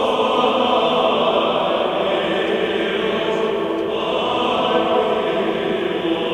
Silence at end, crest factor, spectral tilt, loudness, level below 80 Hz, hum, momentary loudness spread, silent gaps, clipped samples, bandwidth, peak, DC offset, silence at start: 0 s; 14 dB; -5 dB/octave; -19 LUFS; -52 dBFS; none; 4 LU; none; under 0.1%; 13 kHz; -4 dBFS; under 0.1%; 0 s